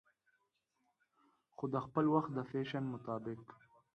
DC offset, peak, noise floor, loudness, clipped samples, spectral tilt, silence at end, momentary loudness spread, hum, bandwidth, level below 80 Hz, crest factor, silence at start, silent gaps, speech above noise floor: under 0.1%; -20 dBFS; -83 dBFS; -39 LUFS; under 0.1%; -9 dB/octave; 0.4 s; 12 LU; none; 6.4 kHz; -76 dBFS; 20 dB; 1.6 s; none; 45 dB